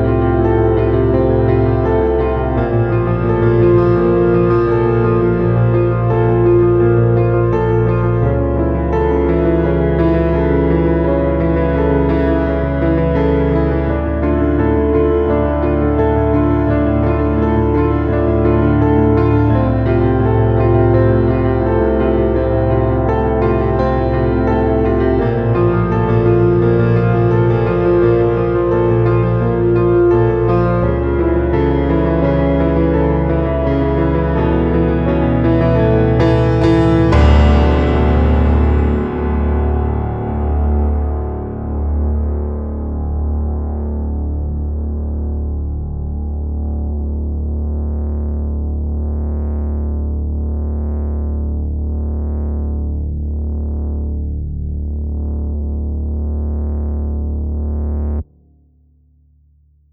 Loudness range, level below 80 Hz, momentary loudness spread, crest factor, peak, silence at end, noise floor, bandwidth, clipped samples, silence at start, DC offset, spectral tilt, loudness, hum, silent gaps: 8 LU; -20 dBFS; 9 LU; 14 dB; 0 dBFS; 1.7 s; -52 dBFS; 5.4 kHz; under 0.1%; 0 s; under 0.1%; -10.5 dB/octave; -15 LUFS; none; none